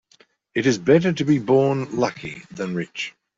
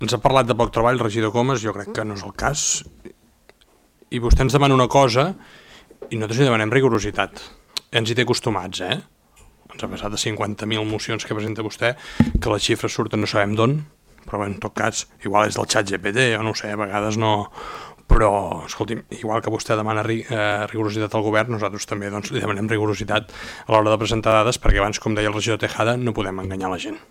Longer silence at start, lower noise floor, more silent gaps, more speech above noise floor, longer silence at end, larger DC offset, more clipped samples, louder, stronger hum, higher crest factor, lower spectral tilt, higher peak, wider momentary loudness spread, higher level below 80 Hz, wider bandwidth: first, 0.55 s vs 0 s; about the same, -58 dBFS vs -57 dBFS; neither; about the same, 37 dB vs 37 dB; first, 0.3 s vs 0.1 s; neither; neither; about the same, -21 LUFS vs -21 LUFS; neither; about the same, 18 dB vs 20 dB; first, -6 dB/octave vs -4.5 dB/octave; about the same, -4 dBFS vs -2 dBFS; first, 13 LU vs 10 LU; second, -58 dBFS vs -32 dBFS; second, 7.8 kHz vs 16 kHz